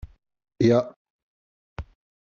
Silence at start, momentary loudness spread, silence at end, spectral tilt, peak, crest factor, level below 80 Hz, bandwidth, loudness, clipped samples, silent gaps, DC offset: 0.05 s; 21 LU; 0.4 s; -7 dB/octave; -8 dBFS; 20 dB; -50 dBFS; 7.2 kHz; -22 LUFS; under 0.1%; 0.96-1.76 s; under 0.1%